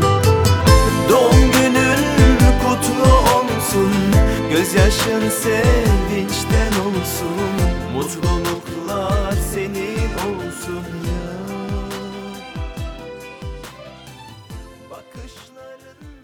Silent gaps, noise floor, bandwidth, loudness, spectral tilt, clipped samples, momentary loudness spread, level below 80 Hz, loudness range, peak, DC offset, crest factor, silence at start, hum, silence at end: none; -41 dBFS; over 20 kHz; -17 LUFS; -5 dB/octave; under 0.1%; 20 LU; -24 dBFS; 18 LU; 0 dBFS; under 0.1%; 16 dB; 0 s; none; 0.1 s